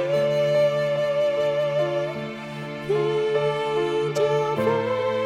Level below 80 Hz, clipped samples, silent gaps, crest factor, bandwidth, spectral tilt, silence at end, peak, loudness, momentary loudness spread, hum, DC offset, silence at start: -62 dBFS; under 0.1%; none; 12 dB; 13 kHz; -6 dB/octave; 0 s; -10 dBFS; -23 LUFS; 9 LU; none; under 0.1%; 0 s